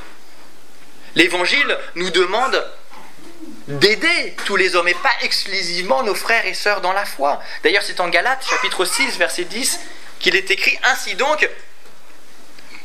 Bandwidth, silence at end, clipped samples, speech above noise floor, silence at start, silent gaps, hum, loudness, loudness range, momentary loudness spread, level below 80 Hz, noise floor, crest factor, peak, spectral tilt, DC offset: 16 kHz; 0.05 s; under 0.1%; 29 dB; 0 s; none; none; -17 LUFS; 2 LU; 6 LU; -68 dBFS; -47 dBFS; 20 dB; 0 dBFS; -2 dB/octave; 5%